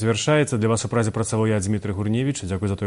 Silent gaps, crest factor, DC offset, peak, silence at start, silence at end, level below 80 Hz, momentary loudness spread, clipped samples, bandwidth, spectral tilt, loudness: none; 14 dB; under 0.1%; -6 dBFS; 0 s; 0 s; -50 dBFS; 6 LU; under 0.1%; 11.5 kHz; -5.5 dB/octave; -22 LUFS